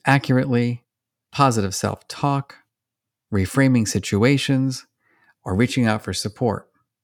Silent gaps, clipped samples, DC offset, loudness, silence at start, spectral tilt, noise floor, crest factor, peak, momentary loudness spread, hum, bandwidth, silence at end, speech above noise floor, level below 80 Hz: none; under 0.1%; under 0.1%; -21 LUFS; 0.05 s; -5.5 dB/octave; -84 dBFS; 20 dB; -2 dBFS; 12 LU; none; 17 kHz; 0.4 s; 65 dB; -60 dBFS